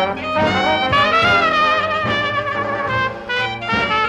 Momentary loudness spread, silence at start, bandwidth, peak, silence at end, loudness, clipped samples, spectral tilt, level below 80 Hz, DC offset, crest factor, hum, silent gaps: 7 LU; 0 s; 13 kHz; -4 dBFS; 0 s; -16 LUFS; under 0.1%; -4.5 dB/octave; -44 dBFS; under 0.1%; 14 dB; none; none